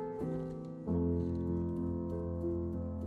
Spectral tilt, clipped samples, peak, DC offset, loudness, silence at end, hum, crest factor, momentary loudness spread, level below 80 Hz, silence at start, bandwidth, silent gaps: -11.5 dB/octave; under 0.1%; -22 dBFS; under 0.1%; -37 LUFS; 0 s; none; 14 dB; 6 LU; -46 dBFS; 0 s; 4.6 kHz; none